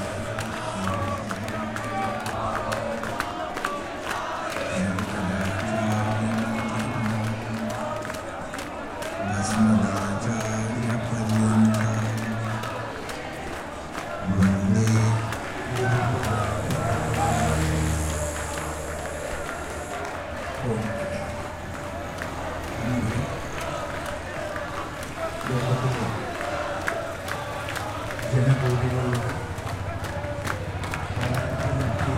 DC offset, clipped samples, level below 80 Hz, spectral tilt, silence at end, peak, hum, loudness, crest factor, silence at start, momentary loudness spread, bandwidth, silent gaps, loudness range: under 0.1%; under 0.1%; -42 dBFS; -6 dB/octave; 0 s; -8 dBFS; none; -27 LUFS; 18 dB; 0 s; 10 LU; 16.5 kHz; none; 6 LU